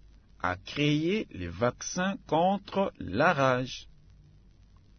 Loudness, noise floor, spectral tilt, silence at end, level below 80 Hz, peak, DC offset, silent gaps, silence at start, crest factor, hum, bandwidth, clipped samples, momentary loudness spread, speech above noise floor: -29 LUFS; -57 dBFS; -5 dB/octave; 1.15 s; -58 dBFS; -10 dBFS; under 0.1%; none; 0.4 s; 20 dB; none; 6.6 kHz; under 0.1%; 9 LU; 28 dB